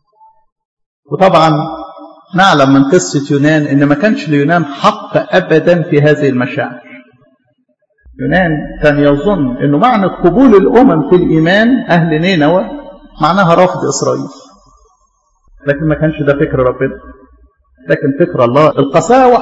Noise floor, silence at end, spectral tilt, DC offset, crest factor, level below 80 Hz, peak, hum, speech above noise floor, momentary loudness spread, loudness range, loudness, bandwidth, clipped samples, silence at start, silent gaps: -59 dBFS; 0 s; -6 dB/octave; under 0.1%; 10 dB; -38 dBFS; 0 dBFS; none; 50 dB; 11 LU; 6 LU; -10 LUFS; 8 kHz; 0.6%; 1.1 s; none